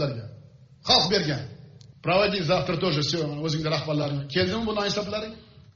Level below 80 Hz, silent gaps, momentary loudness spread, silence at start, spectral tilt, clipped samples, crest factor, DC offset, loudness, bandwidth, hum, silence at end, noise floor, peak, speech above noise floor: -52 dBFS; none; 14 LU; 0 s; -3.5 dB/octave; under 0.1%; 20 dB; under 0.1%; -25 LUFS; 7.2 kHz; none; 0.3 s; -50 dBFS; -6 dBFS; 25 dB